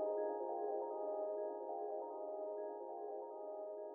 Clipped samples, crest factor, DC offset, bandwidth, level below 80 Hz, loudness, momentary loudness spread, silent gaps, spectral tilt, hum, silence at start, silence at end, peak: under 0.1%; 12 dB; under 0.1%; 1.8 kHz; under -90 dBFS; -45 LUFS; 6 LU; none; 13.5 dB/octave; none; 0 s; 0 s; -30 dBFS